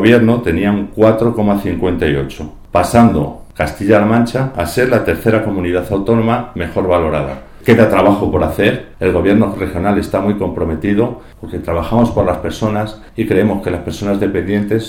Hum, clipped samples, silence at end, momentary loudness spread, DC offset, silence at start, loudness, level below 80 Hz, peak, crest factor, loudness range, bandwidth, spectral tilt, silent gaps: none; under 0.1%; 0 s; 9 LU; under 0.1%; 0 s; -14 LUFS; -32 dBFS; 0 dBFS; 14 dB; 3 LU; 17 kHz; -7 dB/octave; none